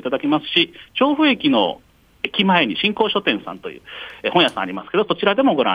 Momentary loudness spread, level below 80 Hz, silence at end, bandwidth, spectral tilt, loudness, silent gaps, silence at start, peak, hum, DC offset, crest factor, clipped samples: 15 LU; -58 dBFS; 0 s; 10.5 kHz; -6 dB/octave; -18 LUFS; none; 0.05 s; -2 dBFS; none; under 0.1%; 16 dB; under 0.1%